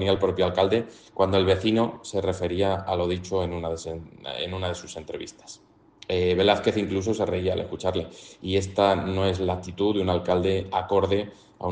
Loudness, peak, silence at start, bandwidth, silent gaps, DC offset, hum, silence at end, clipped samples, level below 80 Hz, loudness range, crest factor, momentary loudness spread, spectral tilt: -25 LUFS; -6 dBFS; 0 s; 9.6 kHz; none; under 0.1%; none; 0 s; under 0.1%; -52 dBFS; 5 LU; 20 dB; 15 LU; -6 dB/octave